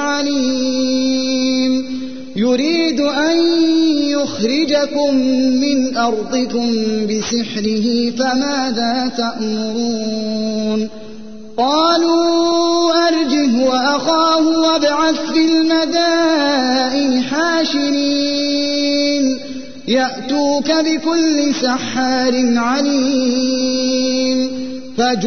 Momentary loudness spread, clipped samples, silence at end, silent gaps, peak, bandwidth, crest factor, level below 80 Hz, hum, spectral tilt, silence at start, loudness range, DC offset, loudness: 6 LU; under 0.1%; 0 s; none; -4 dBFS; 6.6 kHz; 12 dB; -52 dBFS; none; -3.5 dB/octave; 0 s; 4 LU; 2%; -15 LUFS